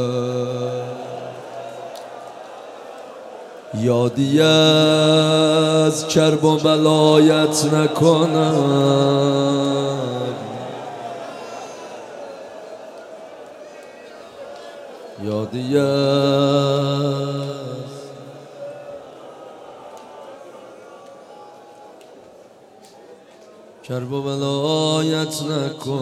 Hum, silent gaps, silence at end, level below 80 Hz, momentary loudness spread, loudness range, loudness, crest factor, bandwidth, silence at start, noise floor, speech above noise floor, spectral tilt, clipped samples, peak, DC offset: none; none; 0 s; -66 dBFS; 24 LU; 22 LU; -17 LUFS; 18 dB; 14.5 kHz; 0 s; -46 dBFS; 30 dB; -5.5 dB/octave; under 0.1%; -2 dBFS; under 0.1%